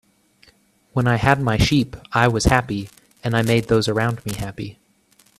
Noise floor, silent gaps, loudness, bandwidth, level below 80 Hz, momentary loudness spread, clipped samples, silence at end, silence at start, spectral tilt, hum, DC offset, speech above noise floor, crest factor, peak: -58 dBFS; none; -20 LUFS; 14.5 kHz; -36 dBFS; 13 LU; under 0.1%; 0.65 s; 0.95 s; -5.5 dB/octave; none; under 0.1%; 39 dB; 20 dB; 0 dBFS